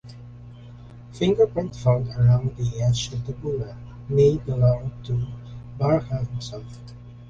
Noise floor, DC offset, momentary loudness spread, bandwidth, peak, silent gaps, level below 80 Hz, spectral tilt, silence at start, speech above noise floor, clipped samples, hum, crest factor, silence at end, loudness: -42 dBFS; under 0.1%; 23 LU; 7.6 kHz; -8 dBFS; none; -44 dBFS; -7.5 dB/octave; 0.05 s; 20 dB; under 0.1%; 60 Hz at -30 dBFS; 16 dB; 0 s; -23 LUFS